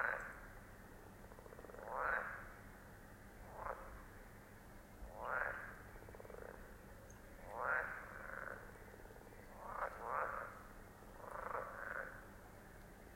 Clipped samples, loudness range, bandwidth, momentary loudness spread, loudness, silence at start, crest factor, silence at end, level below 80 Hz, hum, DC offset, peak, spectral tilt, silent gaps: under 0.1%; 3 LU; 16.5 kHz; 17 LU; -47 LUFS; 0 s; 24 dB; 0 s; -62 dBFS; none; under 0.1%; -26 dBFS; -5 dB/octave; none